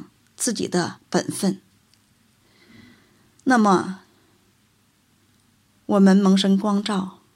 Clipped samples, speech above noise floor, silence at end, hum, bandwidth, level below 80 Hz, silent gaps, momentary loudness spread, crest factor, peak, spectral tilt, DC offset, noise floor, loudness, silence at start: under 0.1%; 43 dB; 0.25 s; none; 14 kHz; -68 dBFS; none; 14 LU; 18 dB; -4 dBFS; -5.5 dB/octave; under 0.1%; -62 dBFS; -20 LUFS; 0 s